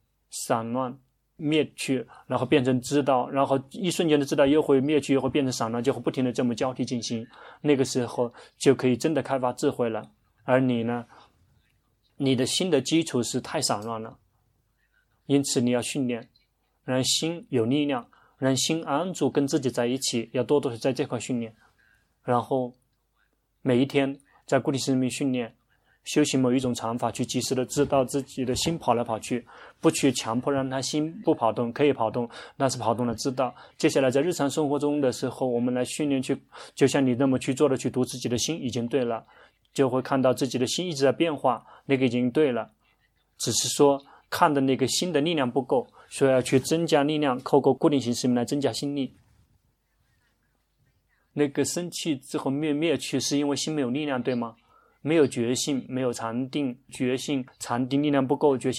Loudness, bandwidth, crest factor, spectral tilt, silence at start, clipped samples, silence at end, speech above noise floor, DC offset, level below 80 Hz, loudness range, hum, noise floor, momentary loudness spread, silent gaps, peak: -26 LUFS; 15 kHz; 22 dB; -5 dB/octave; 0.3 s; under 0.1%; 0 s; 46 dB; under 0.1%; -62 dBFS; 4 LU; none; -71 dBFS; 8 LU; none; -4 dBFS